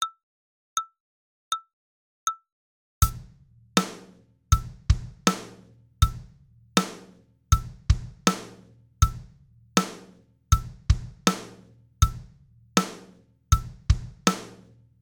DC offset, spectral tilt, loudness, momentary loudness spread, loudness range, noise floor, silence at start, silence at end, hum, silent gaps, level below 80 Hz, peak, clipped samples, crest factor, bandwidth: under 0.1%; -4 dB/octave; -27 LUFS; 18 LU; 3 LU; -55 dBFS; 0 s; 0.5 s; none; 0.23-0.76 s, 1.00-1.51 s, 1.73-2.27 s, 2.52-3.01 s; -32 dBFS; 0 dBFS; under 0.1%; 28 dB; 19.5 kHz